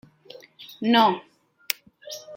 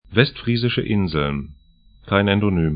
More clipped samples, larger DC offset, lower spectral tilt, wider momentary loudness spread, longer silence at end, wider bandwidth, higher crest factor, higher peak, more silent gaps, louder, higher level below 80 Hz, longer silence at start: neither; neither; second, -3.5 dB/octave vs -11.5 dB/octave; first, 23 LU vs 7 LU; about the same, 0 s vs 0 s; first, 16.5 kHz vs 5.2 kHz; first, 26 dB vs 20 dB; about the same, 0 dBFS vs 0 dBFS; neither; second, -23 LUFS vs -20 LUFS; second, -76 dBFS vs -40 dBFS; first, 0.6 s vs 0.1 s